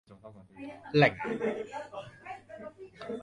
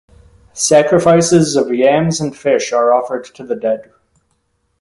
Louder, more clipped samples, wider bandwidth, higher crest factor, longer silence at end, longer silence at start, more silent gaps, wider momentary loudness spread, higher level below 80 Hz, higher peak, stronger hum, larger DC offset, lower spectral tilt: second, -30 LUFS vs -13 LUFS; neither; about the same, 11 kHz vs 11.5 kHz; first, 26 dB vs 14 dB; second, 0 s vs 1 s; second, 0.1 s vs 0.55 s; neither; first, 23 LU vs 13 LU; second, -66 dBFS vs -50 dBFS; second, -8 dBFS vs 0 dBFS; neither; neither; first, -7 dB/octave vs -4.5 dB/octave